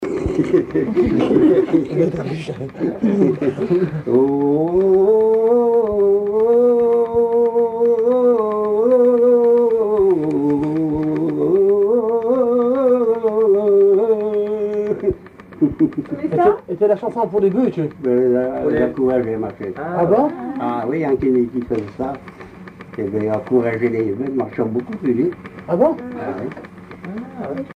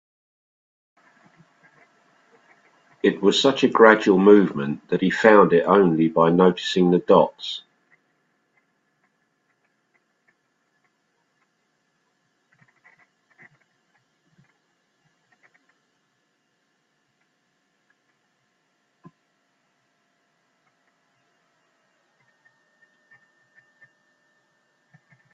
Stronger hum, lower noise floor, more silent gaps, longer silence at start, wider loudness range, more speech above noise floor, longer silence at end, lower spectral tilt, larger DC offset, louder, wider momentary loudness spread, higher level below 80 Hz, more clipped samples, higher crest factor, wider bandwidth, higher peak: neither; second, -37 dBFS vs -71 dBFS; neither; second, 0 s vs 3.05 s; second, 6 LU vs 11 LU; second, 20 dB vs 54 dB; second, 0.05 s vs 17.75 s; first, -9.5 dB/octave vs -6 dB/octave; neither; about the same, -17 LUFS vs -18 LUFS; about the same, 13 LU vs 11 LU; first, -46 dBFS vs -68 dBFS; neither; second, 14 dB vs 24 dB; second, 6.6 kHz vs 7.8 kHz; about the same, -2 dBFS vs 0 dBFS